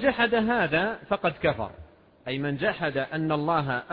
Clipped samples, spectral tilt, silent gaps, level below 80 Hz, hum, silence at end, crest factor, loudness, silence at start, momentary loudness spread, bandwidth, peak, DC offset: under 0.1%; -9 dB/octave; none; -54 dBFS; none; 0 s; 16 dB; -26 LUFS; 0 s; 10 LU; 5.2 kHz; -10 dBFS; under 0.1%